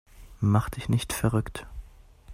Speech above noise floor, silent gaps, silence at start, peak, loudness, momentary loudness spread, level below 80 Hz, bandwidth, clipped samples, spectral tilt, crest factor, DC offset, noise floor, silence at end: 24 dB; none; 0.15 s; -8 dBFS; -27 LUFS; 18 LU; -44 dBFS; 15.5 kHz; under 0.1%; -6 dB/octave; 20 dB; under 0.1%; -49 dBFS; 0 s